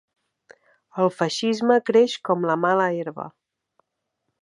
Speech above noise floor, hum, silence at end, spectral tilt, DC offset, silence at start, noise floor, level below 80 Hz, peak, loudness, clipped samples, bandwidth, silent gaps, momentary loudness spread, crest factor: 57 dB; none; 1.15 s; -5 dB/octave; under 0.1%; 0.95 s; -78 dBFS; -76 dBFS; -4 dBFS; -21 LUFS; under 0.1%; 11 kHz; none; 16 LU; 20 dB